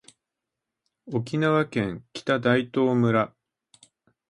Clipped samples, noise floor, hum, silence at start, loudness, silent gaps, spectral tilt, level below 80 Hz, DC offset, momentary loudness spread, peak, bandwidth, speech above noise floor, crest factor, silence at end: under 0.1%; -86 dBFS; none; 1.05 s; -25 LUFS; none; -7 dB/octave; -62 dBFS; under 0.1%; 10 LU; -6 dBFS; 11.5 kHz; 62 dB; 20 dB; 1.05 s